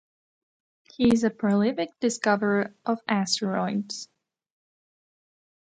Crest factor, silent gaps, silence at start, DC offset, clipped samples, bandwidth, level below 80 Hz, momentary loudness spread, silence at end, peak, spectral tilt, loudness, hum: 20 dB; none; 1 s; under 0.1%; under 0.1%; 9.6 kHz; -62 dBFS; 8 LU; 1.7 s; -8 dBFS; -5 dB/octave; -25 LUFS; none